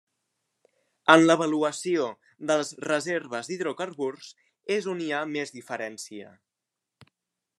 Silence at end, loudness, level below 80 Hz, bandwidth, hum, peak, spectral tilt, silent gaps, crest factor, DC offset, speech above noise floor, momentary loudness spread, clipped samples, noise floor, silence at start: 1.3 s; -26 LUFS; -80 dBFS; 12 kHz; none; 0 dBFS; -4 dB/octave; none; 28 dB; under 0.1%; 60 dB; 19 LU; under 0.1%; -86 dBFS; 1.05 s